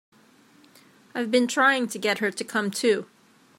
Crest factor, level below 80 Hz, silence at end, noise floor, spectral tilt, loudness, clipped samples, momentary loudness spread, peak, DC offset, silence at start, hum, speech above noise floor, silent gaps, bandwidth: 18 dB; -82 dBFS; 0.55 s; -57 dBFS; -3 dB/octave; -24 LUFS; under 0.1%; 8 LU; -8 dBFS; under 0.1%; 1.15 s; none; 33 dB; none; 16.5 kHz